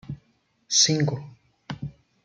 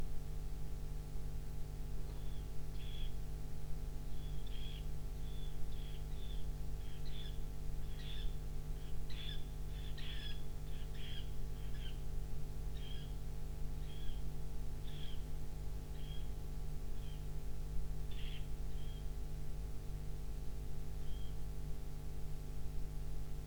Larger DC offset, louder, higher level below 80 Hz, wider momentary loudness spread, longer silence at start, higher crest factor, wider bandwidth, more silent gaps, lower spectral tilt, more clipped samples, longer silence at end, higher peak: neither; first, -21 LUFS vs -48 LUFS; second, -60 dBFS vs -44 dBFS; first, 22 LU vs 2 LU; about the same, 0.1 s vs 0 s; first, 22 dB vs 12 dB; second, 11 kHz vs 19.5 kHz; neither; second, -3 dB/octave vs -5.5 dB/octave; neither; first, 0.35 s vs 0 s; first, -6 dBFS vs -26 dBFS